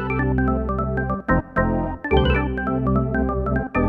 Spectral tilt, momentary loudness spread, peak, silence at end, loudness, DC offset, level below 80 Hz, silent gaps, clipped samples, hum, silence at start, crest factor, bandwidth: -9.5 dB/octave; 4 LU; -4 dBFS; 0 s; -22 LUFS; under 0.1%; -28 dBFS; none; under 0.1%; none; 0 s; 16 dB; 4.2 kHz